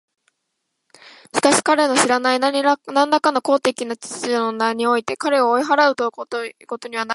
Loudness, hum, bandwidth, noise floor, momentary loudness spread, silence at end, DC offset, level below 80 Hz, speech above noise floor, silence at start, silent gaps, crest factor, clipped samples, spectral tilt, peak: -18 LUFS; none; 11.5 kHz; -75 dBFS; 12 LU; 0 s; under 0.1%; -70 dBFS; 57 dB; 1.05 s; none; 18 dB; under 0.1%; -2 dB/octave; 0 dBFS